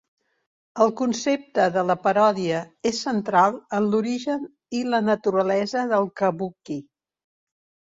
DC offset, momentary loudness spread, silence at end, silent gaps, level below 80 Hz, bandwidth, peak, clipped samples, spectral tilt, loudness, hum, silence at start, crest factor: under 0.1%; 11 LU; 1.1 s; none; -68 dBFS; 7.8 kHz; -4 dBFS; under 0.1%; -5 dB/octave; -23 LUFS; none; 0.75 s; 18 dB